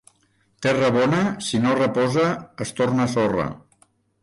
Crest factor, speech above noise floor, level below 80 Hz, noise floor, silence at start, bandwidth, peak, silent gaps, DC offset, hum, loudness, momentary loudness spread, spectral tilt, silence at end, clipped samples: 12 dB; 43 dB; -54 dBFS; -64 dBFS; 0.6 s; 11.5 kHz; -10 dBFS; none; under 0.1%; none; -21 LUFS; 7 LU; -5.5 dB/octave; 0.65 s; under 0.1%